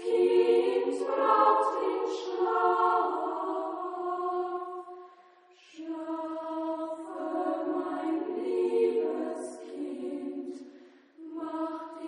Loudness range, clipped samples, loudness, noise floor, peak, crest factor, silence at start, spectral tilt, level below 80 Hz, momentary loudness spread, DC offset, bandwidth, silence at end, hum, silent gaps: 9 LU; under 0.1%; -30 LUFS; -58 dBFS; -12 dBFS; 18 dB; 0 s; -4 dB/octave; -82 dBFS; 16 LU; under 0.1%; 10 kHz; 0 s; none; none